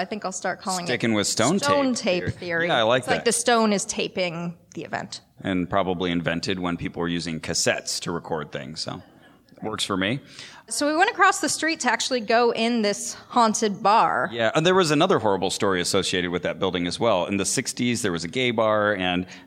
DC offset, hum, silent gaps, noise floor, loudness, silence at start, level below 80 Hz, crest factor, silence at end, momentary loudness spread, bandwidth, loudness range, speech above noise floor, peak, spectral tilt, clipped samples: under 0.1%; none; none; -52 dBFS; -23 LUFS; 0 s; -58 dBFS; 20 dB; 0.05 s; 12 LU; 16.5 kHz; 6 LU; 29 dB; -4 dBFS; -3.5 dB/octave; under 0.1%